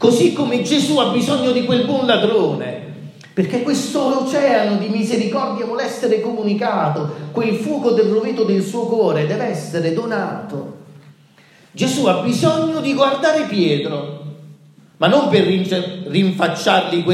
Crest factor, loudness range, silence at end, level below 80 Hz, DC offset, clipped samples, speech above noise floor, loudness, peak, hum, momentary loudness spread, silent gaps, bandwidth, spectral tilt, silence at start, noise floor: 16 dB; 3 LU; 0 s; -68 dBFS; under 0.1%; under 0.1%; 32 dB; -17 LUFS; -2 dBFS; none; 10 LU; none; 14.5 kHz; -5.5 dB/octave; 0 s; -49 dBFS